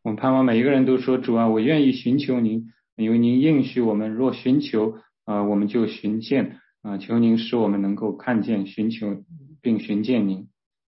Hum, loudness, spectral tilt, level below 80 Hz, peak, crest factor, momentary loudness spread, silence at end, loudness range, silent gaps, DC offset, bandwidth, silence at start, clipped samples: none; -22 LUFS; -11 dB/octave; -68 dBFS; -8 dBFS; 12 dB; 11 LU; 0.45 s; 4 LU; 2.92-2.97 s; under 0.1%; 5.8 kHz; 0.05 s; under 0.1%